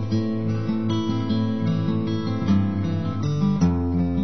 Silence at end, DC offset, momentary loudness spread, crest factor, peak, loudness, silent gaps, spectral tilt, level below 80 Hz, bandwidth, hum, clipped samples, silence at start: 0 s; 1%; 4 LU; 14 dB; -8 dBFS; -23 LUFS; none; -8 dB/octave; -44 dBFS; 6.4 kHz; none; under 0.1%; 0 s